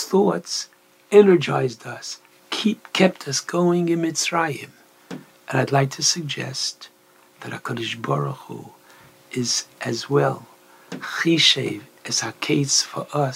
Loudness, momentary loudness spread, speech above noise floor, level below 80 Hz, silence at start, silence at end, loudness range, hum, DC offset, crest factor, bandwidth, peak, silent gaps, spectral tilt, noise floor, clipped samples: -21 LUFS; 20 LU; 30 dB; -72 dBFS; 0 s; 0 s; 7 LU; none; under 0.1%; 22 dB; 16 kHz; -2 dBFS; none; -4 dB/octave; -51 dBFS; under 0.1%